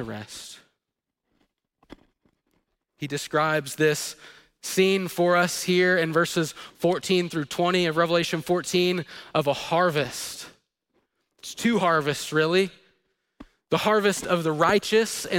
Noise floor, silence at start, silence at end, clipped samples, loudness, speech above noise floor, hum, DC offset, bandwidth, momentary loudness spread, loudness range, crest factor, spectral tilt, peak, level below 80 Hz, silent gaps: -85 dBFS; 0 s; 0 s; under 0.1%; -24 LUFS; 61 dB; none; under 0.1%; 17 kHz; 14 LU; 6 LU; 20 dB; -4.5 dB/octave; -6 dBFS; -62 dBFS; none